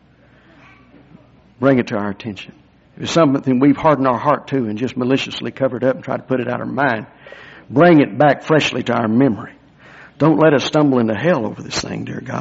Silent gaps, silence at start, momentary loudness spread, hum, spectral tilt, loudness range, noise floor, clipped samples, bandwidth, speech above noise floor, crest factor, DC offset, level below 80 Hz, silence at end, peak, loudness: none; 1.6 s; 13 LU; none; -5 dB/octave; 5 LU; -50 dBFS; under 0.1%; 8 kHz; 34 dB; 16 dB; under 0.1%; -54 dBFS; 0 s; -2 dBFS; -16 LUFS